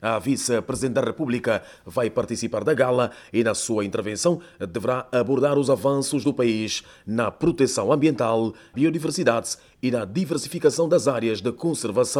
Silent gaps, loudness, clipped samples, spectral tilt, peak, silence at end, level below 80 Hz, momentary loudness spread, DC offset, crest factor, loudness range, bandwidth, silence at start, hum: none; -23 LUFS; under 0.1%; -5 dB/octave; -6 dBFS; 0 s; -56 dBFS; 6 LU; under 0.1%; 18 dB; 2 LU; 18.5 kHz; 0 s; none